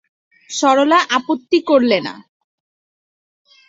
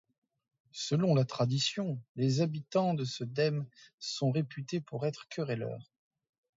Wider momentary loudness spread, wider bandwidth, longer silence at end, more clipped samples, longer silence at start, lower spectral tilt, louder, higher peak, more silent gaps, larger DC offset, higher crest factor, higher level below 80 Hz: second, 8 LU vs 11 LU; about the same, 8 kHz vs 7.8 kHz; first, 1.5 s vs 0.75 s; neither; second, 0.5 s vs 0.75 s; second, -3 dB/octave vs -6 dB/octave; first, -15 LUFS vs -33 LUFS; first, -2 dBFS vs -16 dBFS; second, none vs 2.09-2.15 s, 3.94-3.98 s; neither; about the same, 16 dB vs 18 dB; first, -66 dBFS vs -74 dBFS